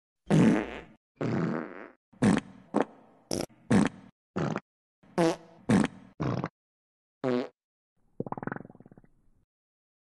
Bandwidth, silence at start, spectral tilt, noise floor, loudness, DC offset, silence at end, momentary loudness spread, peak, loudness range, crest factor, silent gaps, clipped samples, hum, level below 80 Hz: 12 kHz; 0.3 s; -6.5 dB/octave; -60 dBFS; -30 LUFS; under 0.1%; 1.55 s; 14 LU; -10 dBFS; 8 LU; 22 dB; 0.97-1.15 s, 1.96-2.12 s, 4.12-4.34 s, 4.61-5.02 s, 6.14-6.18 s, 6.50-7.21 s, 7.64-7.96 s; under 0.1%; none; -58 dBFS